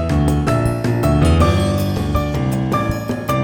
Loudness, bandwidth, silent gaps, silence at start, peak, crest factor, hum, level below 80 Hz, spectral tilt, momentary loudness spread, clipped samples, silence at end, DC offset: -17 LUFS; 19.5 kHz; none; 0 s; -2 dBFS; 14 dB; none; -26 dBFS; -7 dB/octave; 5 LU; under 0.1%; 0 s; under 0.1%